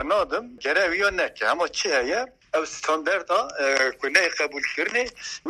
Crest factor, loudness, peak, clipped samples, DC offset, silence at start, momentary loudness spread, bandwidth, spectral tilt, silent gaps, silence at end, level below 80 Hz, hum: 22 dB; -23 LUFS; -2 dBFS; under 0.1%; under 0.1%; 0 s; 7 LU; 13.5 kHz; -1 dB/octave; none; 0 s; -56 dBFS; none